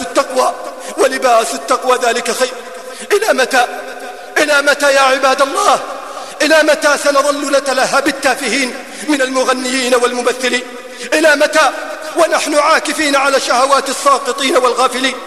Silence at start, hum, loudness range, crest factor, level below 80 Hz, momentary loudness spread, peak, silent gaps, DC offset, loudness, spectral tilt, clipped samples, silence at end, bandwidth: 0 s; none; 3 LU; 14 dB; -60 dBFS; 11 LU; 0 dBFS; none; 0.7%; -12 LUFS; -1 dB/octave; under 0.1%; 0 s; 13.5 kHz